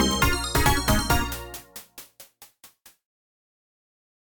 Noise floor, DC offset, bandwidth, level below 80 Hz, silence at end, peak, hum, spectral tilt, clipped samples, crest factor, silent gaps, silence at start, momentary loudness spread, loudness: -54 dBFS; under 0.1%; 19.5 kHz; -34 dBFS; 1.9 s; -6 dBFS; none; -3.5 dB/octave; under 0.1%; 20 dB; none; 0 s; 20 LU; -23 LUFS